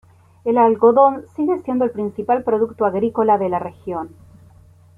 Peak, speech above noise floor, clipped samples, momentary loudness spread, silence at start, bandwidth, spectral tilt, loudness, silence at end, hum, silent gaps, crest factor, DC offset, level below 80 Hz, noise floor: -2 dBFS; 30 dB; under 0.1%; 15 LU; 0.45 s; 3.6 kHz; -9.5 dB/octave; -18 LUFS; 0.9 s; none; none; 16 dB; under 0.1%; -58 dBFS; -48 dBFS